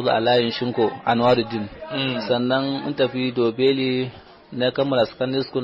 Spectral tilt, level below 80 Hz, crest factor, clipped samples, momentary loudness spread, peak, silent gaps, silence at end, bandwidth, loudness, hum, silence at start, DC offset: -4 dB/octave; -56 dBFS; 14 dB; under 0.1%; 8 LU; -8 dBFS; none; 0 s; 7.4 kHz; -21 LUFS; none; 0 s; under 0.1%